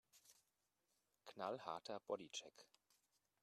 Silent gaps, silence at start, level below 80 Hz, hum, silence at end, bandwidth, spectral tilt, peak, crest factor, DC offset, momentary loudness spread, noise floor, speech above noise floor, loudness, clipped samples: none; 0.15 s; under -90 dBFS; none; 0.75 s; 13.5 kHz; -3 dB/octave; -32 dBFS; 24 dB; under 0.1%; 20 LU; -88 dBFS; 37 dB; -51 LUFS; under 0.1%